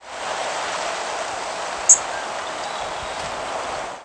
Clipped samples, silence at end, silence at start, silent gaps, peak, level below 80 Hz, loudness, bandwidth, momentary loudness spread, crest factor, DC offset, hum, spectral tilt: under 0.1%; 0 s; 0 s; none; -2 dBFS; -54 dBFS; -22 LUFS; 11 kHz; 14 LU; 22 dB; under 0.1%; none; 0.5 dB/octave